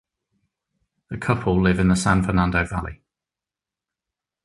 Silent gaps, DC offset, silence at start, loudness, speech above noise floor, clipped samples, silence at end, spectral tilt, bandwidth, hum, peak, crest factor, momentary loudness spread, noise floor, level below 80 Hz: none; under 0.1%; 1.1 s; -21 LUFS; 69 dB; under 0.1%; 1.5 s; -6.5 dB/octave; 11.5 kHz; none; -2 dBFS; 22 dB; 12 LU; -89 dBFS; -38 dBFS